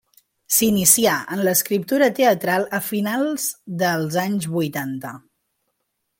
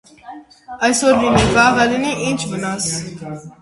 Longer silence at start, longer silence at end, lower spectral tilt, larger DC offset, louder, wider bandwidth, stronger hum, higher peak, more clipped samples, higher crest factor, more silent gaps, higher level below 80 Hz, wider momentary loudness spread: first, 0.5 s vs 0.25 s; first, 1 s vs 0.1 s; about the same, -3.5 dB/octave vs -4 dB/octave; neither; second, -19 LUFS vs -16 LUFS; first, 17 kHz vs 11.5 kHz; neither; about the same, 0 dBFS vs 0 dBFS; neither; about the same, 20 dB vs 18 dB; neither; second, -60 dBFS vs -38 dBFS; second, 11 LU vs 17 LU